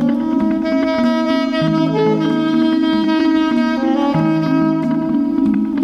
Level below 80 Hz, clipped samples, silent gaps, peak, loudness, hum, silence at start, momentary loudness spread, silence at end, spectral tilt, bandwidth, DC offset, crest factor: -48 dBFS; under 0.1%; none; -4 dBFS; -16 LUFS; none; 0 s; 2 LU; 0 s; -7.5 dB/octave; 7 kHz; under 0.1%; 10 dB